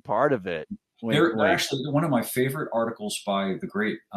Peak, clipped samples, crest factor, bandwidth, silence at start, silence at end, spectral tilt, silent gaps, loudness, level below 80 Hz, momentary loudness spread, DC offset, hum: -8 dBFS; under 0.1%; 18 dB; 13.5 kHz; 0.05 s; 0 s; -5 dB/octave; none; -25 LUFS; -66 dBFS; 9 LU; under 0.1%; none